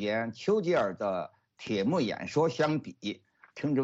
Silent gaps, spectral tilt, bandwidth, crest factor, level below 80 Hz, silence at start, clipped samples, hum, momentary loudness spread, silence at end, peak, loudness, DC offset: none; -6.5 dB/octave; 8 kHz; 14 dB; -70 dBFS; 0 s; under 0.1%; none; 15 LU; 0 s; -16 dBFS; -30 LUFS; under 0.1%